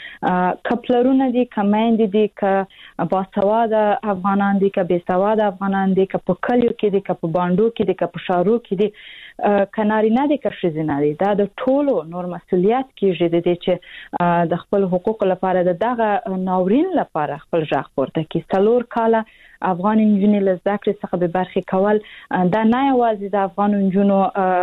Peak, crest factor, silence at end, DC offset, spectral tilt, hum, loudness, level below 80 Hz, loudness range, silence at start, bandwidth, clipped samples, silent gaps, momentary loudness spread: -6 dBFS; 12 dB; 0 s; under 0.1%; -9.5 dB/octave; none; -19 LUFS; -54 dBFS; 1 LU; 0 s; 4.1 kHz; under 0.1%; none; 6 LU